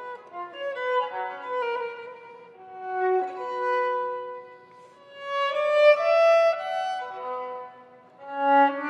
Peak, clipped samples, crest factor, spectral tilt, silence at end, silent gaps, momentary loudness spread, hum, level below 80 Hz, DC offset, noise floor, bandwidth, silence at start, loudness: -8 dBFS; under 0.1%; 18 dB; -3 dB/octave; 0 s; none; 21 LU; none; -88 dBFS; under 0.1%; -50 dBFS; 8.8 kHz; 0 s; -25 LUFS